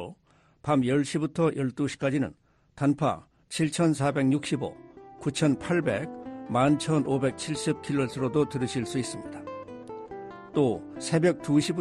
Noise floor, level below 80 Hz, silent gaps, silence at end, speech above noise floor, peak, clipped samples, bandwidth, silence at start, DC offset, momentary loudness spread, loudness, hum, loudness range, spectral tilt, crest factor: -63 dBFS; -60 dBFS; none; 0 s; 36 dB; -12 dBFS; under 0.1%; 12.5 kHz; 0 s; under 0.1%; 15 LU; -27 LUFS; none; 3 LU; -6 dB/octave; 16 dB